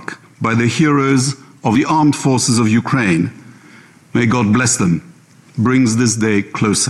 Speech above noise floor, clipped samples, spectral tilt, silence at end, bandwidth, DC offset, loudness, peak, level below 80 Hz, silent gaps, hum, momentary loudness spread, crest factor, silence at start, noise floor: 29 dB; under 0.1%; -5 dB/octave; 0 s; 12.5 kHz; under 0.1%; -15 LUFS; -4 dBFS; -50 dBFS; none; none; 9 LU; 12 dB; 0 s; -43 dBFS